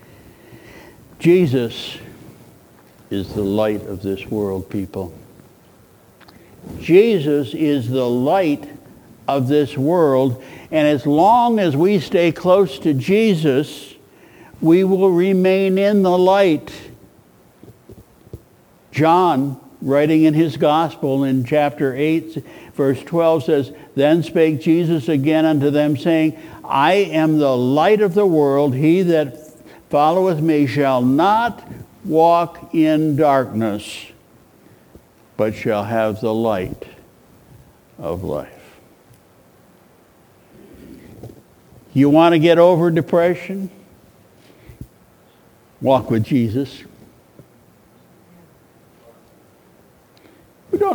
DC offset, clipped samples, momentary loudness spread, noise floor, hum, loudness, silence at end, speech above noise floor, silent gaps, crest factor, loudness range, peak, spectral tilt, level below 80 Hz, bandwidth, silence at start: under 0.1%; under 0.1%; 14 LU; -51 dBFS; none; -17 LUFS; 0 s; 35 dB; none; 18 dB; 9 LU; 0 dBFS; -7.5 dB/octave; -54 dBFS; over 20 kHz; 0.5 s